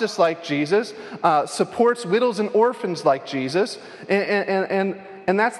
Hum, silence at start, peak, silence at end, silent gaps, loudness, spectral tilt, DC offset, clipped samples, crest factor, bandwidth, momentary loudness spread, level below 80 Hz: none; 0 s; -4 dBFS; 0 s; none; -21 LUFS; -5 dB/octave; under 0.1%; under 0.1%; 18 dB; 12 kHz; 5 LU; -70 dBFS